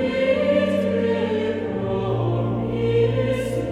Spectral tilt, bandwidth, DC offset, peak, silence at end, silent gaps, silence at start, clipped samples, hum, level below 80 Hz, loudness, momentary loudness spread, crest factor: -7.5 dB/octave; 12 kHz; under 0.1%; -8 dBFS; 0 s; none; 0 s; under 0.1%; none; -44 dBFS; -22 LUFS; 5 LU; 12 dB